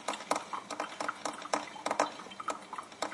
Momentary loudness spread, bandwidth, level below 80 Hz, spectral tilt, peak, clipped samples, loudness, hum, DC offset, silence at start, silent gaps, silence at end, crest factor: 7 LU; 11.5 kHz; -80 dBFS; -2 dB/octave; -12 dBFS; under 0.1%; -37 LUFS; none; under 0.1%; 0 s; none; 0 s; 24 dB